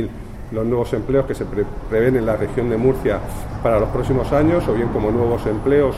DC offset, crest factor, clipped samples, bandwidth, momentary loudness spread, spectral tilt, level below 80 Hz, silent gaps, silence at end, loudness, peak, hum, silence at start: under 0.1%; 14 dB; under 0.1%; 14.5 kHz; 8 LU; -8 dB/octave; -32 dBFS; none; 0 s; -19 LUFS; -4 dBFS; none; 0 s